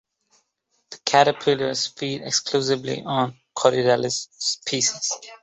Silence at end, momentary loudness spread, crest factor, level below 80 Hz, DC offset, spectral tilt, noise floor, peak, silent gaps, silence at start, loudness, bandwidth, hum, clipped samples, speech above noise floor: 0.05 s; 9 LU; 20 dB; -64 dBFS; under 0.1%; -3 dB/octave; -71 dBFS; -2 dBFS; none; 0.9 s; -22 LUFS; 8.4 kHz; none; under 0.1%; 49 dB